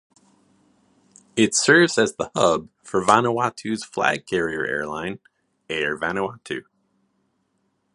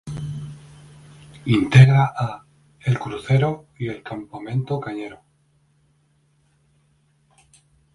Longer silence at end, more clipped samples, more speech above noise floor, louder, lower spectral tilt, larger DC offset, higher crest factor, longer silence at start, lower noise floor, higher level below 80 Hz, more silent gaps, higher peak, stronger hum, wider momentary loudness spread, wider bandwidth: second, 1.35 s vs 2.8 s; neither; first, 49 dB vs 44 dB; about the same, -21 LUFS vs -20 LUFS; second, -3.5 dB/octave vs -7.5 dB/octave; neither; about the same, 24 dB vs 22 dB; first, 1.35 s vs 0.05 s; first, -70 dBFS vs -63 dBFS; second, -60 dBFS vs -52 dBFS; neither; about the same, 0 dBFS vs 0 dBFS; neither; second, 15 LU vs 21 LU; about the same, 11.5 kHz vs 11 kHz